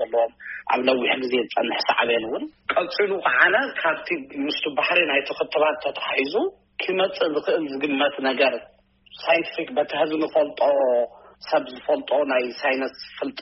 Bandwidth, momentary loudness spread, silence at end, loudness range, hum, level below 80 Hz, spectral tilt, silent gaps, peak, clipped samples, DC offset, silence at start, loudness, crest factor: 6 kHz; 8 LU; 0 s; 2 LU; none; -66 dBFS; -0.5 dB/octave; none; -2 dBFS; under 0.1%; under 0.1%; 0 s; -22 LUFS; 20 dB